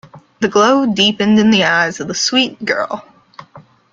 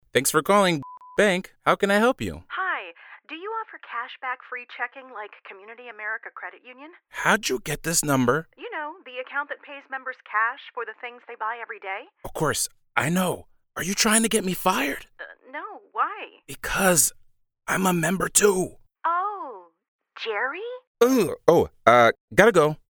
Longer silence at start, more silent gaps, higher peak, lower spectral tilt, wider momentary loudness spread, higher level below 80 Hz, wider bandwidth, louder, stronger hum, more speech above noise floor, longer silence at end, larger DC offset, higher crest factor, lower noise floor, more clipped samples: about the same, 0.15 s vs 0.15 s; second, none vs 19.88-19.99 s, 20.87-20.95 s, 22.20-22.28 s; about the same, 0 dBFS vs 0 dBFS; about the same, -3.5 dB/octave vs -3.5 dB/octave; second, 9 LU vs 19 LU; about the same, -54 dBFS vs -52 dBFS; second, 7.6 kHz vs 19.5 kHz; first, -13 LUFS vs -23 LUFS; neither; first, 29 dB vs 20 dB; first, 0.35 s vs 0.15 s; neither; second, 14 dB vs 24 dB; about the same, -43 dBFS vs -44 dBFS; neither